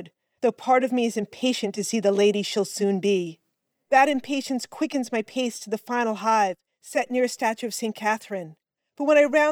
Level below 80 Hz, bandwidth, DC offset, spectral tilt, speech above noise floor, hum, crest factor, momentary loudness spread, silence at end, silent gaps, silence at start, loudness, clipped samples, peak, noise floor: -76 dBFS; 18 kHz; under 0.1%; -4 dB/octave; 53 dB; none; 18 dB; 10 LU; 0 s; none; 0 s; -24 LUFS; under 0.1%; -8 dBFS; -77 dBFS